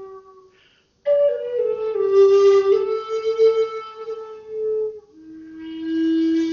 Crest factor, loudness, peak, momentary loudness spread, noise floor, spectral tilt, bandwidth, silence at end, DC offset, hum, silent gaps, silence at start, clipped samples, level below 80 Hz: 14 dB; -19 LUFS; -6 dBFS; 19 LU; -58 dBFS; -3.5 dB/octave; 7 kHz; 0 s; under 0.1%; none; none; 0 s; under 0.1%; -64 dBFS